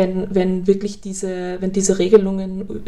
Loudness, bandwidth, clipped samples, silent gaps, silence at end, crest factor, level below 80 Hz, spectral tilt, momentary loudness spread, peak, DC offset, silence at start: -19 LUFS; 12 kHz; under 0.1%; none; 0 s; 18 dB; -42 dBFS; -6 dB/octave; 12 LU; 0 dBFS; 2%; 0 s